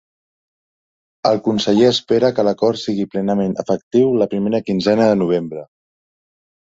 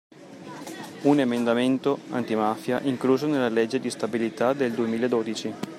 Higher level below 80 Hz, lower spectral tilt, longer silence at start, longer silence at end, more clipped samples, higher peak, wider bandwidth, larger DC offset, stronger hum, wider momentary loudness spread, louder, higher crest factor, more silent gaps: first, -56 dBFS vs -72 dBFS; about the same, -6 dB/octave vs -5.5 dB/octave; first, 1.25 s vs 0.2 s; first, 1.05 s vs 0 s; neither; first, -2 dBFS vs -8 dBFS; second, 7.8 kHz vs 14.5 kHz; neither; neither; second, 7 LU vs 14 LU; first, -17 LUFS vs -25 LUFS; about the same, 16 dB vs 18 dB; first, 3.83-3.91 s vs none